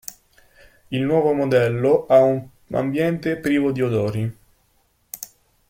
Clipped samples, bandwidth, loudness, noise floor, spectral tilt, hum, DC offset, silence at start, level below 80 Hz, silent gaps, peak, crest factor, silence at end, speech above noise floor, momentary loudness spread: under 0.1%; 16.5 kHz; -20 LUFS; -63 dBFS; -7 dB/octave; none; under 0.1%; 0.1 s; -56 dBFS; none; -4 dBFS; 18 dB; 0.45 s; 45 dB; 19 LU